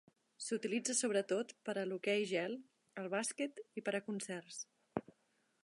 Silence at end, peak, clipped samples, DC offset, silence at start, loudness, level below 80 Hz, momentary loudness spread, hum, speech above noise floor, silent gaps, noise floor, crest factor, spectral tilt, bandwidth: 0.6 s; -22 dBFS; under 0.1%; under 0.1%; 0.4 s; -40 LUFS; -84 dBFS; 12 LU; none; 39 dB; none; -78 dBFS; 20 dB; -3 dB/octave; 11.5 kHz